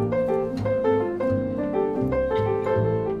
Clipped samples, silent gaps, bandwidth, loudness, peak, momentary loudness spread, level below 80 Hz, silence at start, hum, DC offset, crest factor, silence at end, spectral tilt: under 0.1%; none; 7.4 kHz; -24 LUFS; -10 dBFS; 2 LU; -44 dBFS; 0 s; none; under 0.1%; 12 dB; 0 s; -9.5 dB/octave